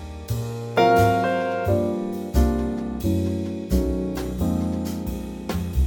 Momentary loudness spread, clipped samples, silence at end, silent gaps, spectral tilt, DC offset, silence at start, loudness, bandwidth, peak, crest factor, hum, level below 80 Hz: 11 LU; under 0.1%; 0 s; none; -7 dB/octave; under 0.1%; 0 s; -24 LUFS; 17.5 kHz; -6 dBFS; 16 dB; none; -30 dBFS